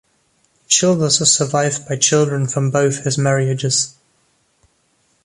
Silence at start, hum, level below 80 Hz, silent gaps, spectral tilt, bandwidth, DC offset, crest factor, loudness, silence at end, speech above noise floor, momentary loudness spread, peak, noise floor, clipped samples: 0.7 s; none; -58 dBFS; none; -3.5 dB/octave; 11.5 kHz; under 0.1%; 18 dB; -16 LUFS; 1.35 s; 45 dB; 5 LU; 0 dBFS; -62 dBFS; under 0.1%